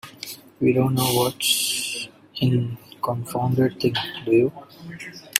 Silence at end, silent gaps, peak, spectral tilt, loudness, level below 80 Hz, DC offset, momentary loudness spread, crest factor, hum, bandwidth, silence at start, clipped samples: 0 s; none; 0 dBFS; -4.5 dB/octave; -22 LUFS; -58 dBFS; under 0.1%; 16 LU; 22 dB; none; 16 kHz; 0.05 s; under 0.1%